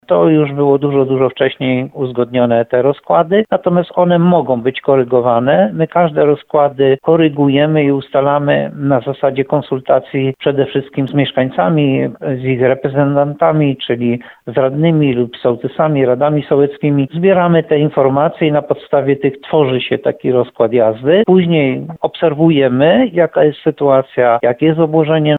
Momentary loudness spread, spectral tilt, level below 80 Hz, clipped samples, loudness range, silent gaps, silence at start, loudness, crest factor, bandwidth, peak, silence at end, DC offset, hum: 6 LU; -10 dB/octave; -54 dBFS; under 0.1%; 3 LU; none; 0.1 s; -13 LUFS; 12 dB; 4.1 kHz; 0 dBFS; 0 s; under 0.1%; none